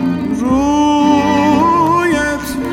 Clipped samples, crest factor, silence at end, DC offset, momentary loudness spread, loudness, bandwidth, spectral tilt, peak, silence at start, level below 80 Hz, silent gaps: under 0.1%; 10 dB; 0 s; under 0.1%; 6 LU; -13 LUFS; 16 kHz; -5.5 dB/octave; -2 dBFS; 0 s; -36 dBFS; none